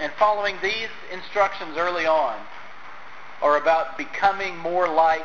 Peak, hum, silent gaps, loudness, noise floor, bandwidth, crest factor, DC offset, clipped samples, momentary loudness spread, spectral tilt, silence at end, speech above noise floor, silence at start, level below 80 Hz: -6 dBFS; none; none; -23 LUFS; -43 dBFS; 7.4 kHz; 18 dB; 1%; under 0.1%; 21 LU; -3.5 dB/octave; 0 s; 20 dB; 0 s; -60 dBFS